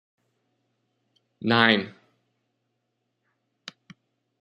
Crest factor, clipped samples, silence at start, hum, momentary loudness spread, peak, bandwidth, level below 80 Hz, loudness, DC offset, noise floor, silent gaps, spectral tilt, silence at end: 28 dB; under 0.1%; 1.4 s; none; 26 LU; -2 dBFS; 10 kHz; -72 dBFS; -21 LUFS; under 0.1%; -78 dBFS; none; -6 dB/octave; 2.5 s